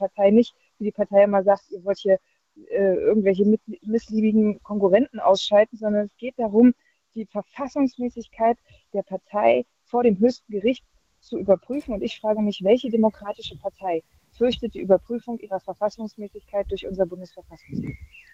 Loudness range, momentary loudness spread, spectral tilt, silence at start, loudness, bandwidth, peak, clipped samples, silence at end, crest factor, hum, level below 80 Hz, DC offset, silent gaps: 6 LU; 14 LU; -7 dB/octave; 0 s; -23 LUFS; 7.8 kHz; -4 dBFS; under 0.1%; 0.3 s; 18 dB; none; -54 dBFS; under 0.1%; none